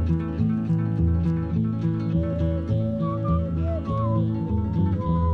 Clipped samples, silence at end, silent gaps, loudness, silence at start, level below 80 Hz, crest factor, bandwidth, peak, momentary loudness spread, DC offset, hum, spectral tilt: under 0.1%; 0 s; none; -25 LUFS; 0 s; -38 dBFS; 12 dB; 4.6 kHz; -12 dBFS; 3 LU; under 0.1%; none; -11 dB/octave